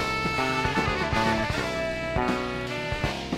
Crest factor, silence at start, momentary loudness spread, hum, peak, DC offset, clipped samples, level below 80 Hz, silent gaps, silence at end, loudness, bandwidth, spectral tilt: 16 dB; 0 s; 5 LU; none; -12 dBFS; under 0.1%; under 0.1%; -40 dBFS; none; 0 s; -26 LUFS; 16 kHz; -5 dB/octave